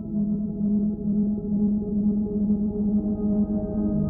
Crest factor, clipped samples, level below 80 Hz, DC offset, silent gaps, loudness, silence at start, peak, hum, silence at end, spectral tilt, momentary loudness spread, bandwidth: 10 dB; under 0.1%; -40 dBFS; under 0.1%; none; -25 LUFS; 0 s; -14 dBFS; none; 0 s; -16 dB/octave; 2 LU; 1.4 kHz